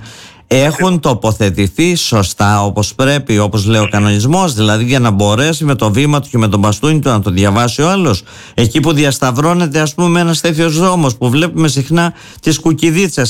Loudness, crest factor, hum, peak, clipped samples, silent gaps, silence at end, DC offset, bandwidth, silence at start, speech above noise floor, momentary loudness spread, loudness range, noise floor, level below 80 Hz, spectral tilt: -12 LUFS; 10 dB; none; -2 dBFS; under 0.1%; none; 0 s; under 0.1%; 16.5 kHz; 0 s; 23 dB; 3 LU; 1 LU; -34 dBFS; -38 dBFS; -5 dB/octave